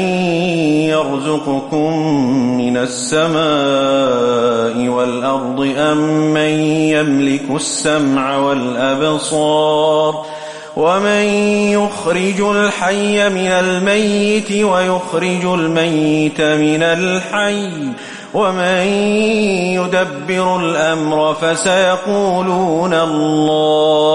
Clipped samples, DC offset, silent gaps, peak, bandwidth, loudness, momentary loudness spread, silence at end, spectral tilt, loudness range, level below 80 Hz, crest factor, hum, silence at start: under 0.1%; under 0.1%; none; -2 dBFS; 11.5 kHz; -14 LUFS; 4 LU; 0 s; -4.5 dB/octave; 1 LU; -54 dBFS; 12 dB; none; 0 s